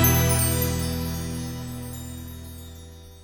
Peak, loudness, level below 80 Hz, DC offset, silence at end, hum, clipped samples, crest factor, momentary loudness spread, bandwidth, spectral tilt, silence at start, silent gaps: -6 dBFS; -25 LUFS; -36 dBFS; under 0.1%; 0 s; none; under 0.1%; 20 dB; 21 LU; over 20 kHz; -4.5 dB/octave; 0 s; none